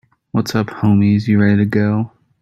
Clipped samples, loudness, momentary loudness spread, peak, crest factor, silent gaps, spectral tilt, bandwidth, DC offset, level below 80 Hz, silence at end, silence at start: under 0.1%; -16 LUFS; 8 LU; -2 dBFS; 12 dB; none; -7.5 dB/octave; 13 kHz; under 0.1%; -52 dBFS; 0.35 s; 0.35 s